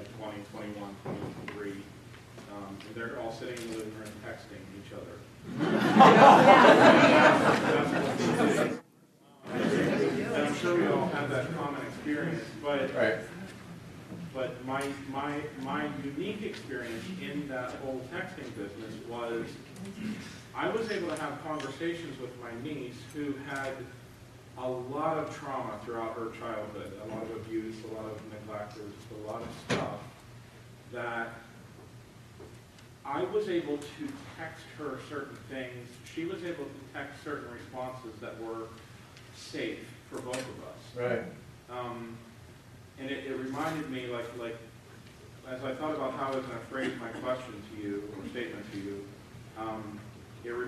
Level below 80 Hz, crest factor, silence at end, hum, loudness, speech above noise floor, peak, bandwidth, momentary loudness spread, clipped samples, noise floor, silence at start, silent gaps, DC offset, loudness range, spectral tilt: -64 dBFS; 26 dB; 0 s; none; -29 LUFS; 30 dB; -4 dBFS; 13.5 kHz; 18 LU; under 0.1%; -59 dBFS; 0 s; none; under 0.1%; 19 LU; -5.5 dB/octave